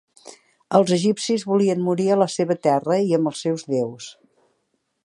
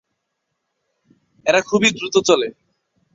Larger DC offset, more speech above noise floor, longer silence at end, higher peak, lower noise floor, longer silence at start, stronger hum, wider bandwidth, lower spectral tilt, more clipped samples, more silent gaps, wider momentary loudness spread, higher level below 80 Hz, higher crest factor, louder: neither; second, 52 dB vs 59 dB; first, 0.95 s vs 0.65 s; about the same, -2 dBFS vs -2 dBFS; second, -72 dBFS vs -76 dBFS; second, 0.25 s vs 1.45 s; neither; first, 11.5 kHz vs 8 kHz; first, -6 dB/octave vs -3 dB/octave; neither; neither; about the same, 7 LU vs 7 LU; second, -72 dBFS vs -60 dBFS; about the same, 20 dB vs 20 dB; second, -21 LUFS vs -17 LUFS